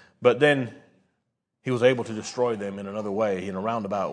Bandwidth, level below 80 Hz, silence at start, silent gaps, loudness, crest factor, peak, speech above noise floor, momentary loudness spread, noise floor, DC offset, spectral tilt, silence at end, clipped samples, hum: 10 kHz; -74 dBFS; 0.2 s; none; -25 LUFS; 22 dB; -4 dBFS; 54 dB; 12 LU; -78 dBFS; under 0.1%; -5.5 dB/octave; 0 s; under 0.1%; none